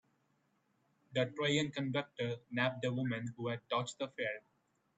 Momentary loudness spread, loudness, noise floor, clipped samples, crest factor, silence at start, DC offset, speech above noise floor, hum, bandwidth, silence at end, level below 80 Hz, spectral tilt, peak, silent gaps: 7 LU; -37 LUFS; -77 dBFS; under 0.1%; 20 dB; 1.1 s; under 0.1%; 40 dB; none; 8.8 kHz; 0.6 s; -80 dBFS; -5 dB/octave; -20 dBFS; none